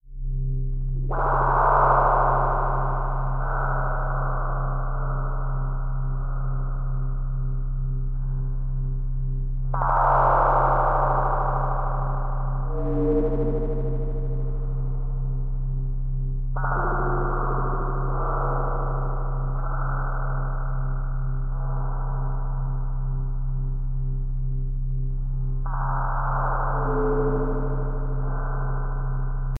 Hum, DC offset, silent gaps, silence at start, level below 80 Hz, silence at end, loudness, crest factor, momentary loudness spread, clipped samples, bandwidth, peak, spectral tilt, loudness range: none; under 0.1%; none; 0.05 s; -26 dBFS; 0 s; -26 LUFS; 16 dB; 10 LU; under 0.1%; 2.2 kHz; -6 dBFS; -11.5 dB/octave; 7 LU